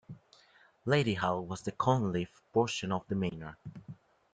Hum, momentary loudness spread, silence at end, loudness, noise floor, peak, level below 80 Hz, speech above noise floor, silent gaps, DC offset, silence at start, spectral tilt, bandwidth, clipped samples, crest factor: none; 20 LU; 0.4 s; -32 LUFS; -64 dBFS; -14 dBFS; -64 dBFS; 32 dB; none; under 0.1%; 0.1 s; -6 dB/octave; 9.4 kHz; under 0.1%; 20 dB